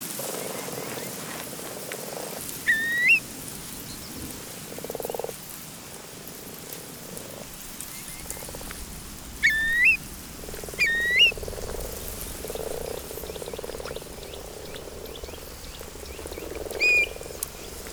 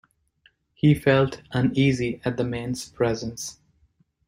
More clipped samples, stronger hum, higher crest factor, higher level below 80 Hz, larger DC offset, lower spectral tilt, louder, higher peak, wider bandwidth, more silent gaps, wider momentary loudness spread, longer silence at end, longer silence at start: neither; neither; about the same, 22 dB vs 18 dB; first, -46 dBFS vs -52 dBFS; neither; second, -1.5 dB/octave vs -6 dB/octave; about the same, -26 LUFS vs -24 LUFS; about the same, -8 dBFS vs -6 dBFS; first, over 20 kHz vs 16 kHz; neither; first, 19 LU vs 12 LU; second, 0 s vs 0.75 s; second, 0 s vs 0.85 s